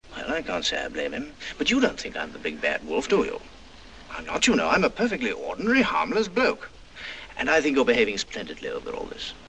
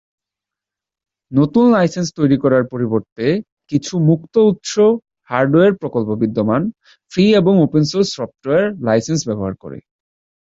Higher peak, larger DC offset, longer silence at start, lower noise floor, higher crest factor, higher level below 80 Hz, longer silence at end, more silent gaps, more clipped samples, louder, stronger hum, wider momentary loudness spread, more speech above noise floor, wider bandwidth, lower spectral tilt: second, -6 dBFS vs -2 dBFS; first, 0.3% vs under 0.1%; second, 0.05 s vs 1.3 s; second, -47 dBFS vs -87 dBFS; first, 20 dB vs 14 dB; about the same, -50 dBFS vs -52 dBFS; second, 0 s vs 0.75 s; second, none vs 3.12-3.16 s, 3.52-3.57 s; neither; second, -25 LUFS vs -16 LUFS; neither; first, 15 LU vs 10 LU; second, 21 dB vs 72 dB; first, 9.6 kHz vs 8 kHz; second, -3.5 dB/octave vs -6.5 dB/octave